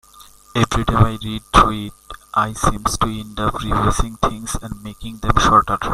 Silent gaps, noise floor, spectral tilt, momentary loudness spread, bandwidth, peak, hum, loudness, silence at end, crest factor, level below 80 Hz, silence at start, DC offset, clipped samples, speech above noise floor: none; -45 dBFS; -5 dB/octave; 14 LU; 15.5 kHz; 0 dBFS; none; -18 LUFS; 0 s; 18 dB; -28 dBFS; 0.2 s; under 0.1%; under 0.1%; 27 dB